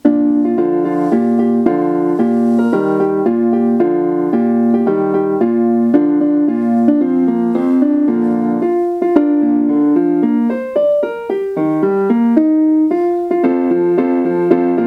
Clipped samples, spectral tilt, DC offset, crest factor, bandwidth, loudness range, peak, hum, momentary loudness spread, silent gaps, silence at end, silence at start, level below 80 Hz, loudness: under 0.1%; -9.5 dB/octave; under 0.1%; 12 dB; 4.3 kHz; 1 LU; 0 dBFS; none; 3 LU; none; 0 s; 0.05 s; -58 dBFS; -14 LUFS